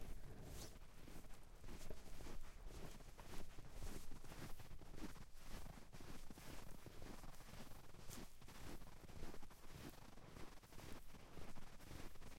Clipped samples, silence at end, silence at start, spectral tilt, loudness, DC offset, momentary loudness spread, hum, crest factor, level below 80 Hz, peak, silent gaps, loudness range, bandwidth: under 0.1%; 0 s; 0 s; -4.5 dB/octave; -60 LUFS; under 0.1%; 4 LU; none; 16 dB; -58 dBFS; -36 dBFS; none; 1 LU; 16.5 kHz